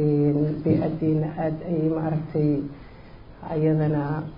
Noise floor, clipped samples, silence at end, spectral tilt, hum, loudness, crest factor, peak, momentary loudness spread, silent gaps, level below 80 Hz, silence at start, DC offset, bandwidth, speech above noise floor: -44 dBFS; under 0.1%; 0 s; -13 dB/octave; none; -24 LUFS; 14 dB; -10 dBFS; 8 LU; none; -48 dBFS; 0 s; under 0.1%; 5.2 kHz; 20 dB